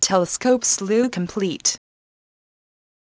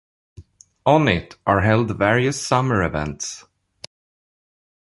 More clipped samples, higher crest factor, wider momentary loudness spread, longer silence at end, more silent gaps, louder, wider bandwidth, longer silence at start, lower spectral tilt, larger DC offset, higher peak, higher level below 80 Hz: neither; about the same, 20 dB vs 20 dB; second, 6 LU vs 11 LU; second, 1.4 s vs 1.55 s; neither; about the same, -20 LUFS vs -20 LUFS; second, 8 kHz vs 11.5 kHz; second, 0 s vs 0.4 s; second, -3 dB/octave vs -5.5 dB/octave; neither; about the same, -2 dBFS vs -2 dBFS; second, -60 dBFS vs -42 dBFS